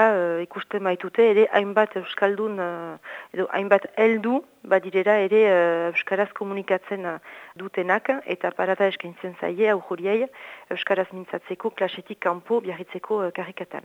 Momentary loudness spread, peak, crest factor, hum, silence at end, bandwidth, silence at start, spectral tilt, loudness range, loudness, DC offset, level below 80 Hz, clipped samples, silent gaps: 14 LU; -4 dBFS; 20 dB; none; 0.05 s; 7.8 kHz; 0 s; -6.5 dB/octave; 5 LU; -24 LUFS; under 0.1%; -80 dBFS; under 0.1%; none